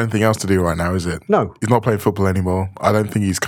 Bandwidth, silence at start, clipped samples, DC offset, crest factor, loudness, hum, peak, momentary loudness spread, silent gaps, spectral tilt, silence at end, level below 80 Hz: 18 kHz; 0 s; under 0.1%; under 0.1%; 18 dB; -18 LUFS; none; 0 dBFS; 4 LU; none; -6 dB/octave; 0 s; -42 dBFS